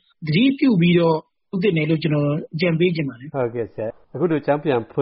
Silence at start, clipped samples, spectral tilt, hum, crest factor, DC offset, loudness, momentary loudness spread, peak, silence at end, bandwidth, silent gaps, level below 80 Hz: 0.2 s; under 0.1%; -6 dB/octave; none; 14 dB; under 0.1%; -20 LUFS; 11 LU; -6 dBFS; 0 s; 5.6 kHz; none; -58 dBFS